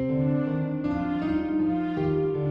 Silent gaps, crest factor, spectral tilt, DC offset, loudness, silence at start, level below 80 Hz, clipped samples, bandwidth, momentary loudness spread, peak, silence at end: none; 10 dB; -10.5 dB/octave; under 0.1%; -26 LUFS; 0 s; -48 dBFS; under 0.1%; 5.6 kHz; 3 LU; -16 dBFS; 0 s